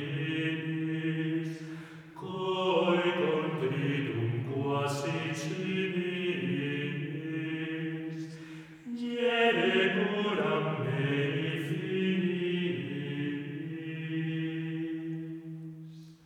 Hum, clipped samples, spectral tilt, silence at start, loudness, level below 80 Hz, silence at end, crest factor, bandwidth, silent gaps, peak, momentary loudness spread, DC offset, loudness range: none; under 0.1%; -6.5 dB/octave; 0 s; -32 LUFS; -76 dBFS; 0.1 s; 20 dB; 14 kHz; none; -12 dBFS; 15 LU; under 0.1%; 6 LU